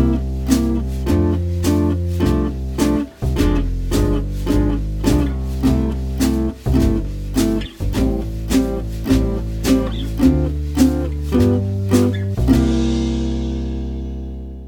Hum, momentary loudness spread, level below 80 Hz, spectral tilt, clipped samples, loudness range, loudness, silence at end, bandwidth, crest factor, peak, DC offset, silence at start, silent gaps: none; 7 LU; -22 dBFS; -7 dB/octave; under 0.1%; 2 LU; -19 LUFS; 0 s; 19 kHz; 16 dB; -2 dBFS; under 0.1%; 0 s; none